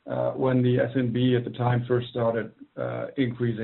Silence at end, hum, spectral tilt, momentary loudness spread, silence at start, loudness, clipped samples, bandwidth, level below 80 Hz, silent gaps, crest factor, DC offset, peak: 0 s; none; -7 dB/octave; 9 LU; 0.05 s; -26 LUFS; under 0.1%; 4.2 kHz; -60 dBFS; none; 16 dB; under 0.1%; -10 dBFS